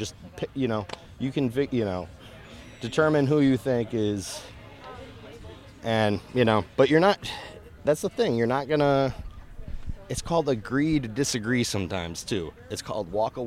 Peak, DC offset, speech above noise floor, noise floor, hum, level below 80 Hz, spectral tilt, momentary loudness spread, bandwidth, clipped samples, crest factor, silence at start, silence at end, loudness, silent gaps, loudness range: -8 dBFS; under 0.1%; 20 dB; -45 dBFS; none; -48 dBFS; -5.5 dB/octave; 22 LU; 15.5 kHz; under 0.1%; 20 dB; 0 s; 0 s; -26 LUFS; none; 4 LU